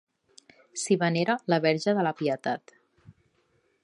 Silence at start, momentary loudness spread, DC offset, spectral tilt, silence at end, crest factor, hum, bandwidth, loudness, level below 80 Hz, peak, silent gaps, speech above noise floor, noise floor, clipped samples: 0.75 s; 10 LU; under 0.1%; -5 dB/octave; 1.25 s; 20 dB; none; 11.5 kHz; -27 LUFS; -76 dBFS; -8 dBFS; none; 44 dB; -70 dBFS; under 0.1%